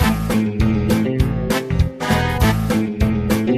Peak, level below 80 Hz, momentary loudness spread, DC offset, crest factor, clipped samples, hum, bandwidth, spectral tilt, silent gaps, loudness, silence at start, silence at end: -4 dBFS; -26 dBFS; 3 LU; under 0.1%; 14 dB; under 0.1%; none; 15 kHz; -6.5 dB/octave; none; -18 LUFS; 0 s; 0 s